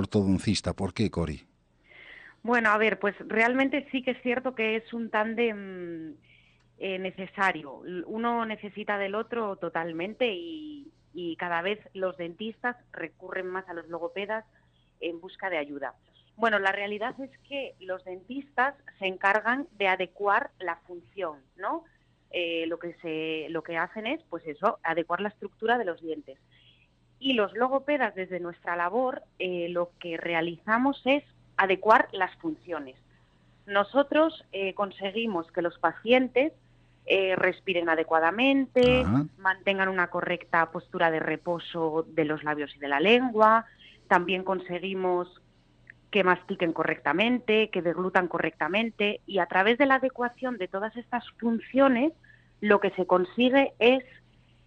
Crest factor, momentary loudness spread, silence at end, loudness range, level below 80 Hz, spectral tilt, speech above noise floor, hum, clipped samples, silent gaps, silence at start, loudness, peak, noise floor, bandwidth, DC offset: 22 dB; 14 LU; 0.65 s; 8 LU; -58 dBFS; -6 dB/octave; 35 dB; none; under 0.1%; none; 0 s; -27 LUFS; -6 dBFS; -63 dBFS; 9 kHz; under 0.1%